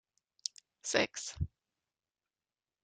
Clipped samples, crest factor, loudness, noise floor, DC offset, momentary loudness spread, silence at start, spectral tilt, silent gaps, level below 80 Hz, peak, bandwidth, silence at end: under 0.1%; 28 dB; -37 LUFS; under -90 dBFS; under 0.1%; 11 LU; 0.85 s; -3 dB/octave; none; -58 dBFS; -12 dBFS; 10 kHz; 1.35 s